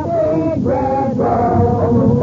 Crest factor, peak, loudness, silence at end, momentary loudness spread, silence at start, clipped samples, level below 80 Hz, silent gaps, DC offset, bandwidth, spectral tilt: 12 dB; -2 dBFS; -15 LUFS; 0 s; 3 LU; 0 s; under 0.1%; -36 dBFS; none; under 0.1%; 7.4 kHz; -10.5 dB/octave